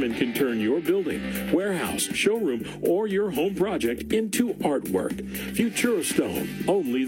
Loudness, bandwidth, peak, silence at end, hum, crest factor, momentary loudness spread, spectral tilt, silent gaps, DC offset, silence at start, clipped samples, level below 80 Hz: -25 LUFS; 17 kHz; -8 dBFS; 0 s; none; 16 dB; 5 LU; -4.5 dB/octave; none; under 0.1%; 0 s; under 0.1%; -52 dBFS